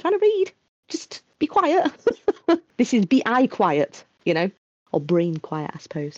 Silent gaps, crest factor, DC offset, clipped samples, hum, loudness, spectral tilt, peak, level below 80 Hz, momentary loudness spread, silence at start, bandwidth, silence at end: 0.69-0.83 s, 4.58-4.86 s; 14 dB; under 0.1%; under 0.1%; none; -22 LUFS; -6 dB/octave; -8 dBFS; -68 dBFS; 13 LU; 0.05 s; 8 kHz; 0.05 s